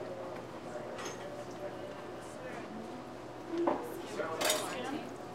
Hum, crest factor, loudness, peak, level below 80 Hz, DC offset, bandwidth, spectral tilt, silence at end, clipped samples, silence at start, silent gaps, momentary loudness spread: none; 24 dB; -39 LUFS; -14 dBFS; -68 dBFS; under 0.1%; 16 kHz; -3 dB/octave; 0 s; under 0.1%; 0 s; none; 12 LU